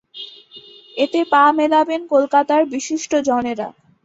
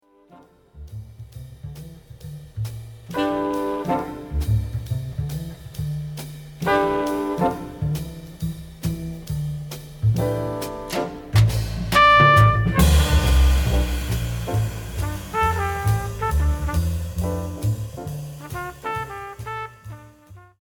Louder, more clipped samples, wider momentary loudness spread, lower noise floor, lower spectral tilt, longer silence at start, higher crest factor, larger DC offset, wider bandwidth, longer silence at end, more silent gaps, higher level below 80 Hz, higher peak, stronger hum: first, -17 LUFS vs -22 LUFS; neither; about the same, 18 LU vs 20 LU; second, -43 dBFS vs -51 dBFS; second, -3 dB/octave vs -5.5 dB/octave; second, 0.15 s vs 0.35 s; about the same, 16 dB vs 20 dB; neither; second, 8 kHz vs 19 kHz; first, 0.35 s vs 0.2 s; neither; second, -62 dBFS vs -28 dBFS; about the same, -2 dBFS vs -2 dBFS; neither